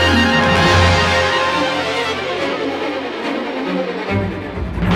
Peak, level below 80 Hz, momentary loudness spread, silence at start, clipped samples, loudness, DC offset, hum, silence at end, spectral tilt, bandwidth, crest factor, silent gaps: -2 dBFS; -32 dBFS; 10 LU; 0 s; under 0.1%; -16 LUFS; under 0.1%; none; 0 s; -5 dB/octave; 13.5 kHz; 16 dB; none